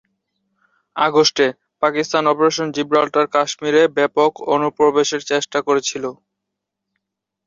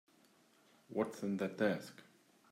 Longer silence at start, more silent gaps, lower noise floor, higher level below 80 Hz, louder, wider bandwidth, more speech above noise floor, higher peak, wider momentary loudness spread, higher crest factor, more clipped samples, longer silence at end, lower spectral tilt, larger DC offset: about the same, 0.95 s vs 0.9 s; neither; first, -80 dBFS vs -69 dBFS; first, -64 dBFS vs -84 dBFS; first, -17 LUFS vs -39 LUFS; second, 7.8 kHz vs 16 kHz; first, 63 dB vs 31 dB; first, -2 dBFS vs -22 dBFS; second, 6 LU vs 16 LU; about the same, 16 dB vs 20 dB; neither; first, 1.35 s vs 0.5 s; second, -3.5 dB/octave vs -6.5 dB/octave; neither